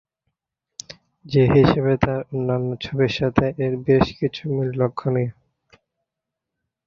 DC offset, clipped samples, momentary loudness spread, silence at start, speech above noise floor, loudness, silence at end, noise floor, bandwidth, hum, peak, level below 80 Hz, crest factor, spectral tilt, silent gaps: under 0.1%; under 0.1%; 11 LU; 0.9 s; 64 dB; -21 LUFS; 1.55 s; -84 dBFS; 7.4 kHz; none; -2 dBFS; -44 dBFS; 20 dB; -7.5 dB/octave; none